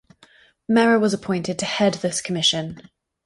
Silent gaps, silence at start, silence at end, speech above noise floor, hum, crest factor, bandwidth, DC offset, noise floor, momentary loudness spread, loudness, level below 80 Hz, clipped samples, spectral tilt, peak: none; 0.7 s; 0.45 s; 34 dB; none; 16 dB; 11.5 kHz; under 0.1%; -54 dBFS; 9 LU; -20 LUFS; -60 dBFS; under 0.1%; -4 dB/octave; -6 dBFS